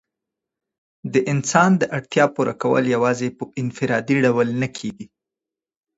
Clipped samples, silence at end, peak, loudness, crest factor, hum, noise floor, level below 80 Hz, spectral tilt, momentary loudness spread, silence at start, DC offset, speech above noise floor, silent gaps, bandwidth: under 0.1%; 0.9 s; -2 dBFS; -20 LUFS; 18 dB; none; -88 dBFS; -62 dBFS; -5.5 dB/octave; 11 LU; 1.05 s; under 0.1%; 69 dB; none; 8 kHz